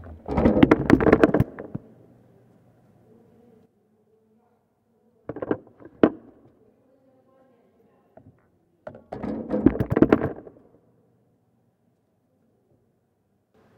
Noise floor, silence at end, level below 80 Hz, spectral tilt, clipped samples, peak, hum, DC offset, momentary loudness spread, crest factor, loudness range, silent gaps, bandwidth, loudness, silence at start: -70 dBFS; 3.35 s; -44 dBFS; -8.5 dB/octave; under 0.1%; 0 dBFS; none; under 0.1%; 25 LU; 26 dB; 17 LU; none; 8.6 kHz; -22 LUFS; 0 s